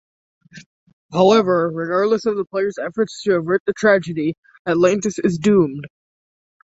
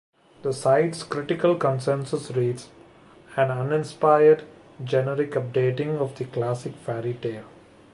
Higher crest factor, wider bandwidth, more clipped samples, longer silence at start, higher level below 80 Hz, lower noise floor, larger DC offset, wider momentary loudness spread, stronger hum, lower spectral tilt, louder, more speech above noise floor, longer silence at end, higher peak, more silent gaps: about the same, 18 dB vs 20 dB; second, 8 kHz vs 11.5 kHz; neither; about the same, 0.55 s vs 0.45 s; first, -58 dBFS vs -64 dBFS; first, under -90 dBFS vs -50 dBFS; neither; second, 9 LU vs 12 LU; neither; about the same, -6 dB/octave vs -7 dB/octave; first, -18 LUFS vs -24 LUFS; first, over 72 dB vs 27 dB; first, 0.9 s vs 0.45 s; about the same, -2 dBFS vs -4 dBFS; first, 0.66-0.87 s, 0.93-1.09 s, 3.60-3.66 s, 4.38-4.43 s, 4.59-4.65 s vs none